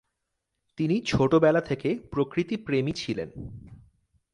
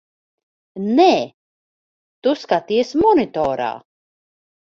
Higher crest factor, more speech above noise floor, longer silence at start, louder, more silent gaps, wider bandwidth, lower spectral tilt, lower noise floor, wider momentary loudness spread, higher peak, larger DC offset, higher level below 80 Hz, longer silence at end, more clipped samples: about the same, 18 dB vs 18 dB; second, 56 dB vs over 73 dB; about the same, 0.8 s vs 0.75 s; second, -26 LUFS vs -18 LUFS; second, none vs 1.34-2.22 s; first, 11.5 kHz vs 7.4 kHz; about the same, -6.5 dB/octave vs -5.5 dB/octave; second, -81 dBFS vs under -90 dBFS; about the same, 17 LU vs 15 LU; second, -10 dBFS vs -2 dBFS; neither; about the same, -52 dBFS vs -54 dBFS; second, 0.6 s vs 0.9 s; neither